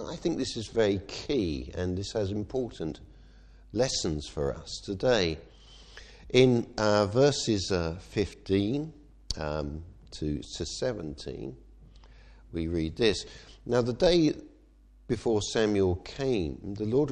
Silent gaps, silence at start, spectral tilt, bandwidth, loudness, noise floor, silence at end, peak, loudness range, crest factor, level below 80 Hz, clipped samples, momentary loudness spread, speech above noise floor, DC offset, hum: none; 0 s; -5.5 dB/octave; 10 kHz; -29 LUFS; -57 dBFS; 0 s; -6 dBFS; 8 LU; 24 dB; -48 dBFS; under 0.1%; 15 LU; 28 dB; under 0.1%; none